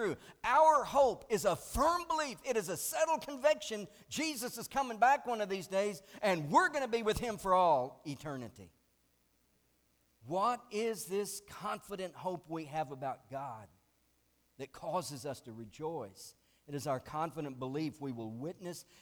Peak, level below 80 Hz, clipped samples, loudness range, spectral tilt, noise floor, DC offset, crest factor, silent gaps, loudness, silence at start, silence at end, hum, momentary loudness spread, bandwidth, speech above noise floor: -14 dBFS; -60 dBFS; under 0.1%; 11 LU; -4 dB/octave; -74 dBFS; under 0.1%; 20 dB; none; -35 LUFS; 0 s; 0.2 s; none; 15 LU; over 20 kHz; 39 dB